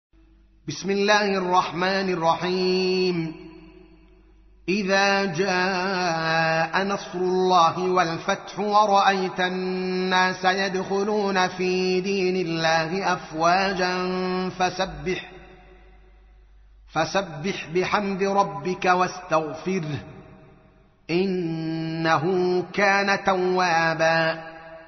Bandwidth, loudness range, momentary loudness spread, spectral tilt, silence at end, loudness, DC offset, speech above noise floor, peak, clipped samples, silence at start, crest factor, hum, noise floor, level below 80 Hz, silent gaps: 6.4 kHz; 5 LU; 8 LU; -3 dB/octave; 0 s; -23 LUFS; under 0.1%; 33 dB; -4 dBFS; under 0.1%; 0.65 s; 20 dB; none; -55 dBFS; -54 dBFS; none